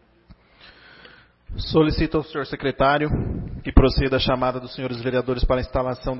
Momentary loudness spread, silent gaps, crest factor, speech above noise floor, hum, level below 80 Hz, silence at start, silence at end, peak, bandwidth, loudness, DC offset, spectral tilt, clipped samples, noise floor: 11 LU; none; 22 dB; 32 dB; none; -30 dBFS; 0.3 s; 0 s; 0 dBFS; 5.8 kHz; -22 LUFS; under 0.1%; -10 dB/octave; under 0.1%; -52 dBFS